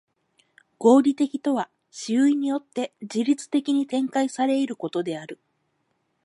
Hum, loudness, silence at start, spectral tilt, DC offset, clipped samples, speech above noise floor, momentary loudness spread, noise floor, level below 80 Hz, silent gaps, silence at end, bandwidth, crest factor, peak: none; -23 LUFS; 0.8 s; -5 dB/octave; under 0.1%; under 0.1%; 50 dB; 13 LU; -72 dBFS; -78 dBFS; none; 0.9 s; 11.5 kHz; 20 dB; -4 dBFS